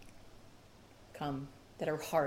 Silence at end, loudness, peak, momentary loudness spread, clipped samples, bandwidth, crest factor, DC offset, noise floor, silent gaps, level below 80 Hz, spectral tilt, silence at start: 0 s; -40 LUFS; -18 dBFS; 22 LU; under 0.1%; 17 kHz; 22 dB; under 0.1%; -59 dBFS; none; -64 dBFS; -5.5 dB/octave; 0 s